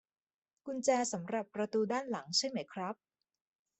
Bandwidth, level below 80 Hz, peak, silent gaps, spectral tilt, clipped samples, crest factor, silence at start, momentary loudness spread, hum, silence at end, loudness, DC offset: 8.4 kHz; -82 dBFS; -18 dBFS; none; -3 dB/octave; under 0.1%; 20 dB; 0.65 s; 11 LU; none; 0.85 s; -35 LUFS; under 0.1%